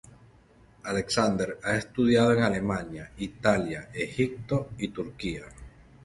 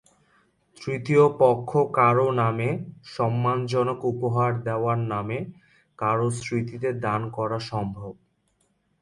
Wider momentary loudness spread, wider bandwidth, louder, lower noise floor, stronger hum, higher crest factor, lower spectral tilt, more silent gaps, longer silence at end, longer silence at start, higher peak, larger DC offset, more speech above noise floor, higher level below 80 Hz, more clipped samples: about the same, 15 LU vs 13 LU; about the same, 11.5 kHz vs 11 kHz; second, -28 LUFS vs -24 LUFS; second, -57 dBFS vs -69 dBFS; neither; about the same, 20 dB vs 18 dB; second, -5.5 dB/octave vs -7.5 dB/octave; neither; second, 0.35 s vs 0.9 s; second, 0.05 s vs 0.8 s; about the same, -8 dBFS vs -6 dBFS; neither; second, 30 dB vs 46 dB; first, -52 dBFS vs -60 dBFS; neither